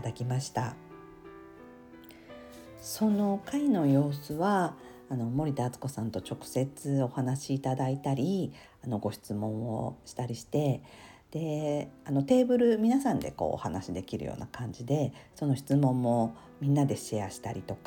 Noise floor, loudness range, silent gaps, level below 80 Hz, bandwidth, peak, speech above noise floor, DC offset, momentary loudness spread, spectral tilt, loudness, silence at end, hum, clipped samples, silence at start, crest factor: -51 dBFS; 5 LU; none; -60 dBFS; 18.5 kHz; -12 dBFS; 21 dB; under 0.1%; 22 LU; -7 dB/octave; -31 LUFS; 0.05 s; none; under 0.1%; 0 s; 18 dB